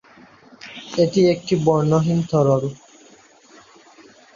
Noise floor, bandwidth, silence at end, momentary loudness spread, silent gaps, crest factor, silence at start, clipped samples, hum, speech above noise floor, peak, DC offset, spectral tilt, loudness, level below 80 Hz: -50 dBFS; 7.4 kHz; 1.6 s; 18 LU; none; 18 dB; 0.65 s; under 0.1%; none; 32 dB; -4 dBFS; under 0.1%; -7 dB/octave; -19 LUFS; -56 dBFS